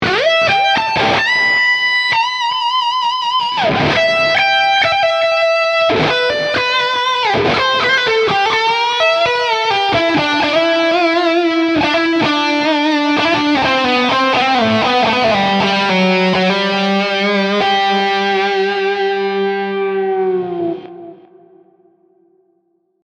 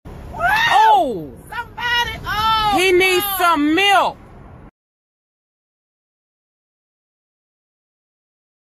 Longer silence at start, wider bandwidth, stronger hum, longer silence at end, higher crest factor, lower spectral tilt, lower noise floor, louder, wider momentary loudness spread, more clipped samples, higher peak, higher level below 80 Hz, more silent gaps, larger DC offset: about the same, 0 s vs 0.05 s; second, 10.5 kHz vs 15.5 kHz; neither; second, 1.9 s vs 3.95 s; about the same, 12 dB vs 16 dB; first, -4.5 dB/octave vs -3 dB/octave; first, -62 dBFS vs -40 dBFS; about the same, -13 LUFS vs -15 LUFS; second, 4 LU vs 17 LU; neither; about the same, -2 dBFS vs -4 dBFS; second, -50 dBFS vs -44 dBFS; neither; neither